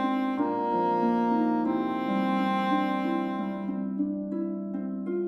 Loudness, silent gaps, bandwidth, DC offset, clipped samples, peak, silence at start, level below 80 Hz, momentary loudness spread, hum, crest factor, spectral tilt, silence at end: -28 LUFS; none; 7 kHz; under 0.1%; under 0.1%; -14 dBFS; 0 s; -72 dBFS; 7 LU; none; 14 dB; -8 dB/octave; 0 s